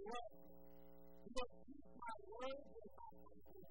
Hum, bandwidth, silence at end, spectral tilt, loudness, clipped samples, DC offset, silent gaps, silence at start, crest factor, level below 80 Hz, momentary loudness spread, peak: 60 Hz at -75 dBFS; 16 kHz; 0 s; -4 dB/octave; -55 LUFS; under 0.1%; 0.1%; none; 0 s; 24 dB; -68 dBFS; 14 LU; -30 dBFS